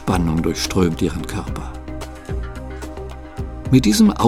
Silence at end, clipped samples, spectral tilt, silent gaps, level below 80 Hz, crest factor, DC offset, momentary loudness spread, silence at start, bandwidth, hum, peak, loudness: 0 s; under 0.1%; -5.5 dB/octave; none; -30 dBFS; 18 dB; under 0.1%; 17 LU; 0 s; 16 kHz; none; -2 dBFS; -19 LUFS